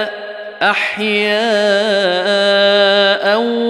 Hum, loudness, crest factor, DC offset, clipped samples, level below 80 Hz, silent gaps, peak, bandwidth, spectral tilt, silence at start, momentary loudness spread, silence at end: none; -13 LUFS; 12 dB; under 0.1%; under 0.1%; -70 dBFS; none; -2 dBFS; 12 kHz; -3.5 dB/octave; 0 s; 6 LU; 0 s